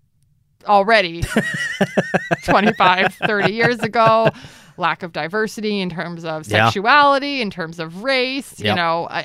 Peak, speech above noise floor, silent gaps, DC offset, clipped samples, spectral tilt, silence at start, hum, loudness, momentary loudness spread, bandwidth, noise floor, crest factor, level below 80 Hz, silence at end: 0 dBFS; 42 dB; none; under 0.1%; under 0.1%; -5 dB/octave; 0.65 s; none; -17 LUFS; 11 LU; 15.5 kHz; -60 dBFS; 18 dB; -46 dBFS; 0 s